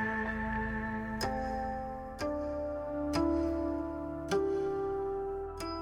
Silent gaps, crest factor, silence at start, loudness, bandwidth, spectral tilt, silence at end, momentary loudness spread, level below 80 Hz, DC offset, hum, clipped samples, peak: none; 14 dB; 0 s; -35 LUFS; 16 kHz; -6 dB/octave; 0 s; 7 LU; -46 dBFS; under 0.1%; none; under 0.1%; -20 dBFS